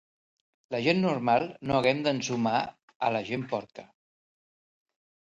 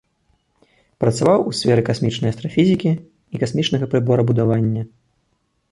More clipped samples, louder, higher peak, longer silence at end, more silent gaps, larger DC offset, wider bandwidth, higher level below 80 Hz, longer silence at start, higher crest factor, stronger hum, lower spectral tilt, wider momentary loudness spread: neither; second, -28 LUFS vs -19 LUFS; second, -10 dBFS vs -2 dBFS; first, 1.35 s vs 0.85 s; first, 2.83-2.88 s, 2.95-3.00 s vs none; neither; about the same, 10.5 kHz vs 11.5 kHz; second, -64 dBFS vs -52 dBFS; second, 0.7 s vs 1 s; about the same, 20 dB vs 16 dB; neither; about the same, -5.5 dB/octave vs -6.5 dB/octave; about the same, 10 LU vs 9 LU